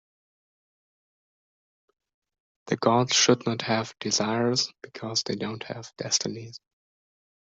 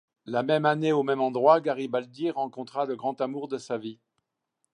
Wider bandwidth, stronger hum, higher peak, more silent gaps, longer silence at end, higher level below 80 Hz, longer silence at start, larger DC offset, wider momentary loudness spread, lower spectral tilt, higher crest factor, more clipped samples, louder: second, 8.2 kHz vs 10.5 kHz; neither; about the same, -6 dBFS vs -6 dBFS; neither; about the same, 0.85 s vs 0.8 s; first, -70 dBFS vs -82 dBFS; first, 2.65 s vs 0.25 s; neither; first, 16 LU vs 12 LU; second, -3 dB/octave vs -6.5 dB/octave; about the same, 24 dB vs 22 dB; neither; about the same, -25 LUFS vs -27 LUFS